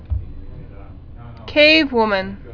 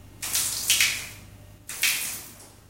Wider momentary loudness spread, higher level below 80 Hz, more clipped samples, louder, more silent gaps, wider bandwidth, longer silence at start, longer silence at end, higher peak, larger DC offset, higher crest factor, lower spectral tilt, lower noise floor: first, 23 LU vs 19 LU; first, -34 dBFS vs -54 dBFS; neither; first, -14 LUFS vs -24 LUFS; neither; second, 5.4 kHz vs 17 kHz; about the same, 0 s vs 0 s; second, 0 s vs 0.2 s; about the same, 0 dBFS vs -2 dBFS; neither; second, 18 dB vs 28 dB; first, -6 dB/octave vs 1 dB/octave; second, -36 dBFS vs -47 dBFS